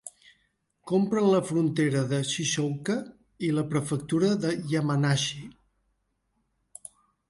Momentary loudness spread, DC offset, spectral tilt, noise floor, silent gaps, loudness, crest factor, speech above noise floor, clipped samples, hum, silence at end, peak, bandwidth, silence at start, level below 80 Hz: 22 LU; under 0.1%; -5.5 dB/octave; -75 dBFS; none; -27 LUFS; 16 dB; 49 dB; under 0.1%; none; 1.8 s; -12 dBFS; 11.5 kHz; 0.05 s; -66 dBFS